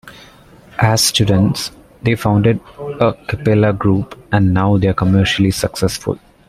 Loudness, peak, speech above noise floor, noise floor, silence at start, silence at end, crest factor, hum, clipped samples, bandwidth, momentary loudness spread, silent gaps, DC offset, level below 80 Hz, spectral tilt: -15 LUFS; 0 dBFS; 28 dB; -43 dBFS; 0.05 s; 0.3 s; 14 dB; none; under 0.1%; 15 kHz; 10 LU; none; under 0.1%; -40 dBFS; -5.5 dB/octave